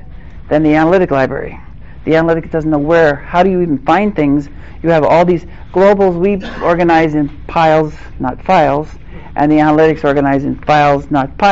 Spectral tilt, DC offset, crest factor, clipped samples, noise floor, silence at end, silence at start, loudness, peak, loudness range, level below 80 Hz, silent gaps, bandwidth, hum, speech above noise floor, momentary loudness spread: -5.5 dB/octave; 2%; 10 dB; under 0.1%; -31 dBFS; 0 s; 0 s; -12 LUFS; -2 dBFS; 1 LU; -32 dBFS; none; 7.8 kHz; none; 20 dB; 10 LU